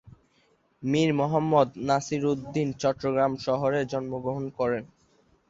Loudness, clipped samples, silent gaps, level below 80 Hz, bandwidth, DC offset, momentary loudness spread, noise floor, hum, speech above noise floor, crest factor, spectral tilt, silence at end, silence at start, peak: -27 LUFS; under 0.1%; none; -60 dBFS; 8 kHz; under 0.1%; 8 LU; -66 dBFS; none; 40 dB; 20 dB; -6.5 dB/octave; 0.65 s; 0.05 s; -8 dBFS